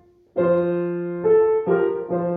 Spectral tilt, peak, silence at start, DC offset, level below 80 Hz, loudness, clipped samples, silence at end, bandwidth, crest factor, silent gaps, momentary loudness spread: -12 dB/octave; -8 dBFS; 0.35 s; under 0.1%; -62 dBFS; -21 LUFS; under 0.1%; 0 s; 4 kHz; 12 dB; none; 7 LU